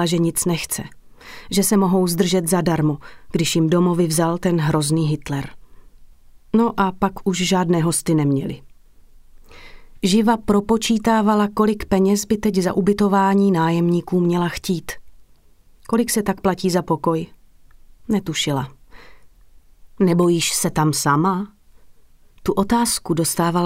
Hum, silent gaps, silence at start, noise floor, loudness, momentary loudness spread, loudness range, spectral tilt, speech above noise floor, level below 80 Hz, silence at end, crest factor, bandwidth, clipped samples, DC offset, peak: none; none; 0 s; -50 dBFS; -19 LUFS; 9 LU; 5 LU; -5 dB/octave; 32 dB; -44 dBFS; 0 s; 16 dB; 16 kHz; under 0.1%; under 0.1%; -4 dBFS